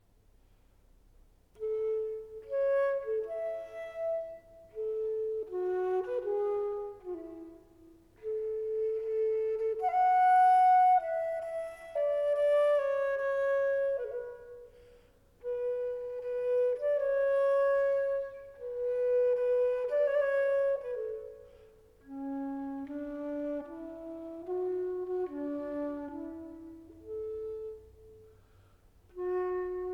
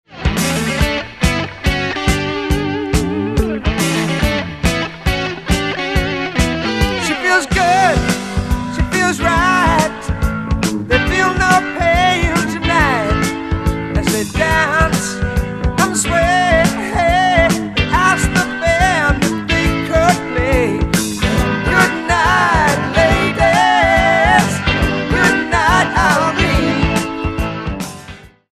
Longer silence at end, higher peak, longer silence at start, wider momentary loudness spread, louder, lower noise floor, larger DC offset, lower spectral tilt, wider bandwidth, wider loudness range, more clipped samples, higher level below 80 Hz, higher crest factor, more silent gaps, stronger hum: second, 0 s vs 0.25 s; second, -18 dBFS vs 0 dBFS; first, 1.6 s vs 0.1 s; first, 17 LU vs 7 LU; second, -31 LUFS vs -15 LUFS; first, -64 dBFS vs -36 dBFS; neither; first, -6 dB/octave vs -4.5 dB/octave; second, 11 kHz vs 14 kHz; first, 12 LU vs 5 LU; neither; second, -66 dBFS vs -24 dBFS; about the same, 14 dB vs 14 dB; neither; neither